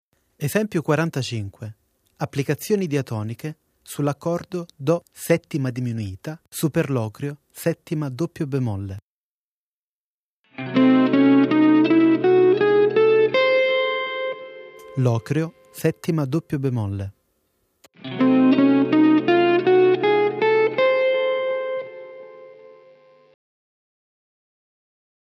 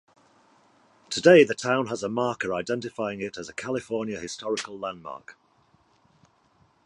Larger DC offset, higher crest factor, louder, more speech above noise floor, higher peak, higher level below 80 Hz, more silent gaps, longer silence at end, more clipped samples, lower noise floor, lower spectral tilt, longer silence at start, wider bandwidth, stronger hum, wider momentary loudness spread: neither; second, 18 dB vs 24 dB; first, -20 LUFS vs -25 LUFS; first, over 66 dB vs 39 dB; about the same, -4 dBFS vs -4 dBFS; about the same, -64 dBFS vs -66 dBFS; first, 9.02-10.44 s vs none; first, 2.7 s vs 1.55 s; neither; first, under -90 dBFS vs -63 dBFS; first, -6.5 dB/octave vs -4.5 dB/octave; second, 0.4 s vs 1.1 s; first, 15.5 kHz vs 11 kHz; neither; about the same, 17 LU vs 18 LU